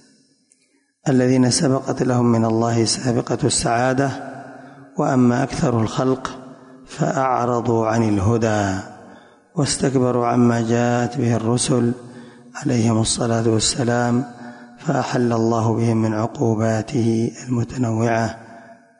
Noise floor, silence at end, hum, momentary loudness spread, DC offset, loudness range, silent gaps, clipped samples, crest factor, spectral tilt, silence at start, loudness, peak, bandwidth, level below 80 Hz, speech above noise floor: -63 dBFS; 0.25 s; none; 12 LU; under 0.1%; 2 LU; none; under 0.1%; 14 dB; -5.5 dB/octave; 1.05 s; -19 LUFS; -6 dBFS; 11 kHz; -46 dBFS; 44 dB